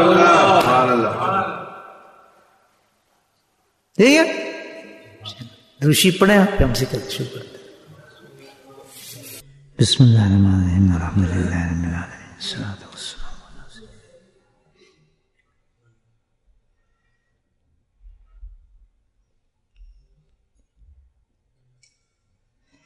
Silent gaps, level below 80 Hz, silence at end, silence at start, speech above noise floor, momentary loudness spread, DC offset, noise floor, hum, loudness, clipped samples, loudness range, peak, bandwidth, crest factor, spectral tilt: none; -40 dBFS; 4.4 s; 0 s; 52 dB; 24 LU; under 0.1%; -69 dBFS; none; -17 LUFS; under 0.1%; 14 LU; -2 dBFS; 13.5 kHz; 20 dB; -5.5 dB/octave